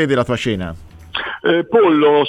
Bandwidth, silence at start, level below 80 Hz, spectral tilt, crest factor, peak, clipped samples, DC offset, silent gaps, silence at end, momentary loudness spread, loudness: 10 kHz; 0 s; -44 dBFS; -6 dB/octave; 14 dB; -2 dBFS; under 0.1%; under 0.1%; none; 0 s; 13 LU; -16 LUFS